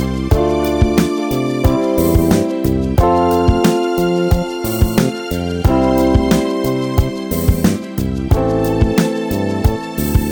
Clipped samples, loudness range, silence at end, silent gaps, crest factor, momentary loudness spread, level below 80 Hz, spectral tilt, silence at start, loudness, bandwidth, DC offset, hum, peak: under 0.1%; 2 LU; 0 s; none; 14 dB; 6 LU; -22 dBFS; -6.5 dB/octave; 0 s; -15 LUFS; over 20 kHz; under 0.1%; none; 0 dBFS